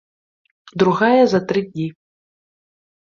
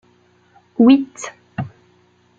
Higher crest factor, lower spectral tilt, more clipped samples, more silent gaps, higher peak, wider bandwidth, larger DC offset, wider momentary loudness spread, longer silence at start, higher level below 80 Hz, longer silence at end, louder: about the same, 18 dB vs 18 dB; about the same, -7 dB/octave vs -6 dB/octave; neither; neither; about the same, -2 dBFS vs -2 dBFS; about the same, 7.2 kHz vs 7.8 kHz; neither; second, 14 LU vs 20 LU; about the same, 0.75 s vs 0.8 s; about the same, -60 dBFS vs -60 dBFS; first, 1.2 s vs 0.7 s; second, -17 LUFS vs -14 LUFS